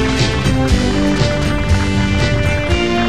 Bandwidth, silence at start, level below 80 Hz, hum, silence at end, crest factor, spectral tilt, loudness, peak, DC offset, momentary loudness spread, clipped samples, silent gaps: 14 kHz; 0 s; -22 dBFS; none; 0 s; 14 dB; -5.5 dB/octave; -15 LUFS; 0 dBFS; 4%; 1 LU; under 0.1%; none